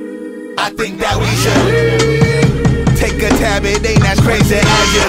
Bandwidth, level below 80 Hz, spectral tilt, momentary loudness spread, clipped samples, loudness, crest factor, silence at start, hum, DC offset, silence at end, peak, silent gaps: 16.5 kHz; -22 dBFS; -5 dB/octave; 8 LU; under 0.1%; -12 LUFS; 12 dB; 0 s; none; under 0.1%; 0 s; 0 dBFS; none